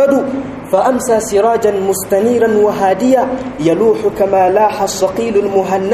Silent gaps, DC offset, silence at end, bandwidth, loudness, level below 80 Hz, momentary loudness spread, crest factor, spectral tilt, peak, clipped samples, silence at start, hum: none; under 0.1%; 0 s; 15 kHz; -13 LUFS; -44 dBFS; 5 LU; 12 dB; -5 dB/octave; 0 dBFS; under 0.1%; 0 s; none